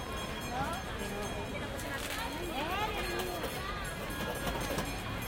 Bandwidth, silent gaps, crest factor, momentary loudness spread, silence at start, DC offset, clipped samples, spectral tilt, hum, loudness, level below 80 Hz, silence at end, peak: 17 kHz; none; 16 dB; 4 LU; 0 s; under 0.1%; under 0.1%; -4 dB/octave; none; -36 LUFS; -46 dBFS; 0 s; -20 dBFS